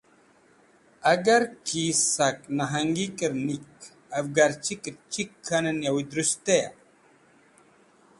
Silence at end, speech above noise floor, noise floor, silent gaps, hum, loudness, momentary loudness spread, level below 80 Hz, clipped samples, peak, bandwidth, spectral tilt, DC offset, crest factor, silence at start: 1.5 s; 34 dB; -59 dBFS; none; none; -26 LUFS; 11 LU; -66 dBFS; under 0.1%; -6 dBFS; 11.5 kHz; -3 dB/octave; under 0.1%; 20 dB; 1.05 s